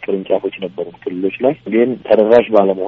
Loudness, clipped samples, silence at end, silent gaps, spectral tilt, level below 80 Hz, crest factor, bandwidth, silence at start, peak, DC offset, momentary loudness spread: -15 LUFS; under 0.1%; 0 s; none; -5 dB/octave; -58 dBFS; 14 dB; 6 kHz; 0 s; 0 dBFS; under 0.1%; 14 LU